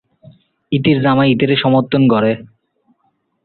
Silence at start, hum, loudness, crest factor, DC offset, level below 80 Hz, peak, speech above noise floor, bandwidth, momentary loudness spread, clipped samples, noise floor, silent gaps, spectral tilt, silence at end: 0.7 s; none; -14 LUFS; 14 dB; under 0.1%; -52 dBFS; -2 dBFS; 51 dB; 4.4 kHz; 6 LU; under 0.1%; -64 dBFS; none; -11.5 dB/octave; 1 s